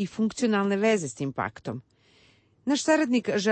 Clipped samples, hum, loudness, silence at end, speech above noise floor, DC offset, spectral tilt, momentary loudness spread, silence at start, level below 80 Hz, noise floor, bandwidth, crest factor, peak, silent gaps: under 0.1%; none; -26 LUFS; 0 s; 35 dB; under 0.1%; -4.5 dB/octave; 14 LU; 0 s; -68 dBFS; -61 dBFS; 8.8 kHz; 16 dB; -12 dBFS; none